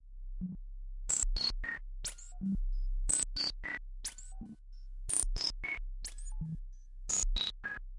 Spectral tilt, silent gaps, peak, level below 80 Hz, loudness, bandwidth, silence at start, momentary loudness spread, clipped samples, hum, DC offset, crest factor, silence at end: -1.5 dB/octave; none; -10 dBFS; -40 dBFS; -36 LUFS; 11.5 kHz; 0 s; 18 LU; under 0.1%; none; under 0.1%; 26 dB; 0 s